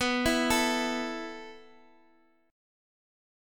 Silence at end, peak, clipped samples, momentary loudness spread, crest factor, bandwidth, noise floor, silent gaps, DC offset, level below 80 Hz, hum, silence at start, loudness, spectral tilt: 1.85 s; -12 dBFS; under 0.1%; 18 LU; 20 dB; 17.5 kHz; -66 dBFS; none; under 0.1%; -52 dBFS; none; 0 s; -28 LUFS; -2.5 dB/octave